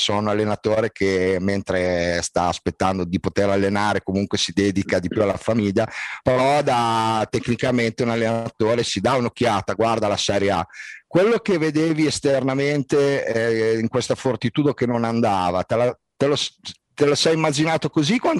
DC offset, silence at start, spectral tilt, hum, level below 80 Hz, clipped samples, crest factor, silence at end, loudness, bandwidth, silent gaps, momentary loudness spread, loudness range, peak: under 0.1%; 0 s; -5 dB/octave; none; -52 dBFS; under 0.1%; 16 dB; 0 s; -21 LUFS; 12 kHz; none; 5 LU; 1 LU; -4 dBFS